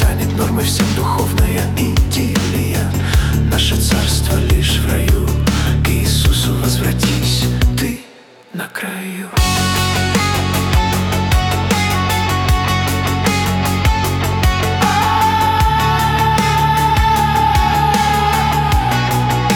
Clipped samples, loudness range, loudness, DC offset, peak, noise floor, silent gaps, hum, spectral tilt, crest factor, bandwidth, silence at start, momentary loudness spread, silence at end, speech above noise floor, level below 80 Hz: under 0.1%; 4 LU; -15 LUFS; under 0.1%; -2 dBFS; -41 dBFS; none; none; -4.5 dB/octave; 12 dB; 18 kHz; 0 s; 4 LU; 0 s; 27 dB; -22 dBFS